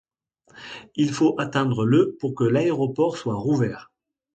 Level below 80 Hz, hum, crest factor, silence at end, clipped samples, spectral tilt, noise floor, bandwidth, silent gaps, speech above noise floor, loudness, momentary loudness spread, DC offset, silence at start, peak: -60 dBFS; none; 18 dB; 0.5 s; under 0.1%; -7 dB/octave; -62 dBFS; 9 kHz; none; 40 dB; -22 LUFS; 17 LU; under 0.1%; 0.55 s; -6 dBFS